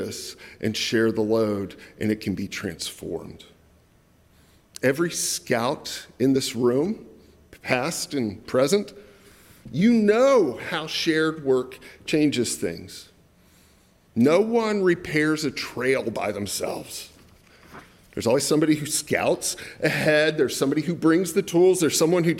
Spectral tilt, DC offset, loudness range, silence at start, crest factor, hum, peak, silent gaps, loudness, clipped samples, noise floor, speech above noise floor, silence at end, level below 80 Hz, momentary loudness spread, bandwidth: -4.5 dB/octave; under 0.1%; 6 LU; 0 s; 20 dB; none; -4 dBFS; none; -23 LUFS; under 0.1%; -58 dBFS; 35 dB; 0 s; -58 dBFS; 15 LU; 16.5 kHz